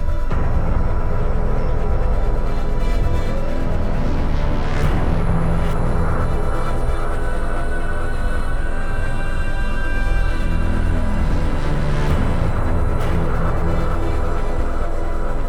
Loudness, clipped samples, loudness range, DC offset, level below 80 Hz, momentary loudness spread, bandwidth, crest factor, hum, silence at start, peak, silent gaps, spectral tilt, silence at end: -23 LUFS; under 0.1%; 3 LU; under 0.1%; -18 dBFS; 5 LU; 9.6 kHz; 12 dB; none; 0 s; -4 dBFS; none; -7.5 dB/octave; 0 s